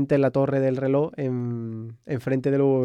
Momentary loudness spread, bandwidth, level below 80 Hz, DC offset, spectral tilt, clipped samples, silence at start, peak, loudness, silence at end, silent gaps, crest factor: 11 LU; 8.2 kHz; -62 dBFS; under 0.1%; -9.5 dB/octave; under 0.1%; 0 s; -10 dBFS; -24 LUFS; 0 s; none; 12 dB